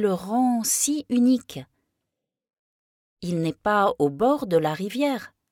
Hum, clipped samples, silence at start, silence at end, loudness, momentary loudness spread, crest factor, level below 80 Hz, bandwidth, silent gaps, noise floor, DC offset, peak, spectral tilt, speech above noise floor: none; under 0.1%; 0 s; 0.25 s; -23 LUFS; 10 LU; 16 dB; -62 dBFS; 17 kHz; 2.59-3.17 s; -83 dBFS; under 0.1%; -8 dBFS; -4.5 dB/octave; 61 dB